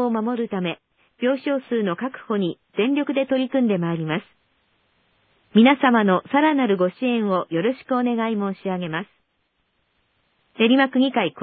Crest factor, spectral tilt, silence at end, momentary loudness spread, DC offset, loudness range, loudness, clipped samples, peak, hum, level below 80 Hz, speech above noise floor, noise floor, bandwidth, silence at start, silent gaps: 20 dB; -11 dB/octave; 0 s; 10 LU; under 0.1%; 5 LU; -21 LUFS; under 0.1%; -2 dBFS; none; -74 dBFS; 50 dB; -71 dBFS; 4.7 kHz; 0 s; none